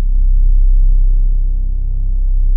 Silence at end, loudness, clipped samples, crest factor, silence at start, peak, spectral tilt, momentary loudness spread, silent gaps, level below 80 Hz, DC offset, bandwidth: 0 s; -18 LUFS; under 0.1%; 6 dB; 0 s; -4 dBFS; -16 dB/octave; 6 LU; none; -10 dBFS; under 0.1%; 0.5 kHz